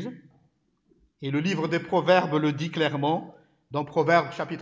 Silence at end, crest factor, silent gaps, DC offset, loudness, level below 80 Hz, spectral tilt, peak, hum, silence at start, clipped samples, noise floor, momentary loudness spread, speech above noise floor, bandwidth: 0 s; 20 dB; none; under 0.1%; -25 LUFS; -70 dBFS; -6.5 dB/octave; -6 dBFS; none; 0 s; under 0.1%; -68 dBFS; 11 LU; 43 dB; 7.8 kHz